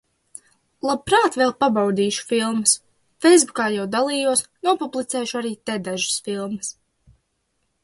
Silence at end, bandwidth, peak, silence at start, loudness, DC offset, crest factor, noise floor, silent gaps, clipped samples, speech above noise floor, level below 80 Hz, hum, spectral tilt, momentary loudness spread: 1.15 s; 11.5 kHz; -2 dBFS; 0.85 s; -20 LUFS; under 0.1%; 20 dB; -72 dBFS; none; under 0.1%; 51 dB; -60 dBFS; none; -3 dB/octave; 11 LU